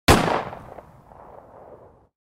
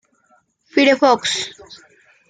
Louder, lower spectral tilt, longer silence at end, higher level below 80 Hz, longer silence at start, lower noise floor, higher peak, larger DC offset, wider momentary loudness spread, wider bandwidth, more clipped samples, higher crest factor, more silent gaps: second, -21 LUFS vs -16 LUFS; first, -4.5 dB/octave vs -2 dB/octave; about the same, 0.55 s vs 0.55 s; first, -36 dBFS vs -66 dBFS; second, 0.1 s vs 0.75 s; second, -48 dBFS vs -59 dBFS; about the same, -2 dBFS vs -2 dBFS; neither; first, 28 LU vs 10 LU; first, 16 kHz vs 9.6 kHz; neither; first, 24 dB vs 18 dB; neither